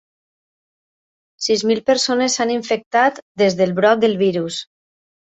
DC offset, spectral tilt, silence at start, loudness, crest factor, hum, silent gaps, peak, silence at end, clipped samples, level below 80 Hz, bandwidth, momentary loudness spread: under 0.1%; -3.5 dB/octave; 1.4 s; -17 LUFS; 18 dB; none; 2.86-2.91 s, 3.22-3.35 s; -2 dBFS; 0.75 s; under 0.1%; -62 dBFS; 8.4 kHz; 8 LU